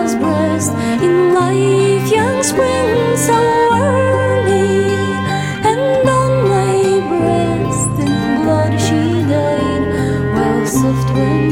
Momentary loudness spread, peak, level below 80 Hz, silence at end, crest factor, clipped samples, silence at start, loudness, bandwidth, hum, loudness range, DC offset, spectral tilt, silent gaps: 4 LU; -2 dBFS; -38 dBFS; 0 s; 12 dB; under 0.1%; 0 s; -14 LUFS; 16.5 kHz; none; 2 LU; under 0.1%; -5.5 dB/octave; none